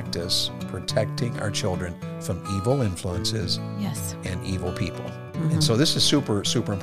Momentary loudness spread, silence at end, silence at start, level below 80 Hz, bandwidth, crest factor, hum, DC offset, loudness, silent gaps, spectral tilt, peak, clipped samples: 11 LU; 0 s; 0 s; -52 dBFS; 15.5 kHz; 18 dB; none; under 0.1%; -25 LUFS; none; -4.5 dB/octave; -6 dBFS; under 0.1%